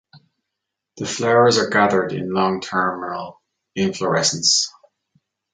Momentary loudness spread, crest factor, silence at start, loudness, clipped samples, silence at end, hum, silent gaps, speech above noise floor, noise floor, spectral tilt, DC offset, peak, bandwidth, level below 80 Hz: 14 LU; 18 dB; 0.15 s; -18 LUFS; under 0.1%; 0.85 s; none; none; 63 dB; -81 dBFS; -3 dB/octave; under 0.1%; -2 dBFS; 9.6 kHz; -60 dBFS